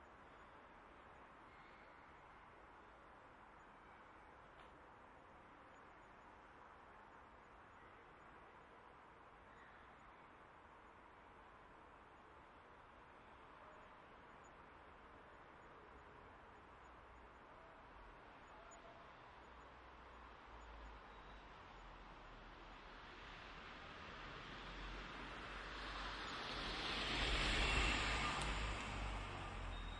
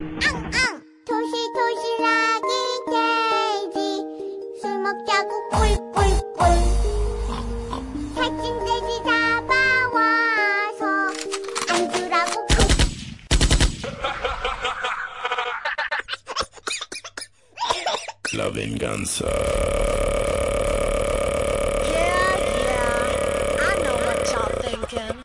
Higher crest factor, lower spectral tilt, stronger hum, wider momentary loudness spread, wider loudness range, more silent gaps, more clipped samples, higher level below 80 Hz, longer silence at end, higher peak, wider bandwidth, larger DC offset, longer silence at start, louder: first, 24 dB vs 18 dB; about the same, -3.5 dB/octave vs -4 dB/octave; neither; first, 20 LU vs 10 LU; first, 21 LU vs 6 LU; neither; neither; second, -56 dBFS vs -30 dBFS; about the same, 0 s vs 0 s; second, -26 dBFS vs -4 dBFS; about the same, 10.5 kHz vs 11.5 kHz; neither; about the same, 0 s vs 0 s; second, -46 LUFS vs -22 LUFS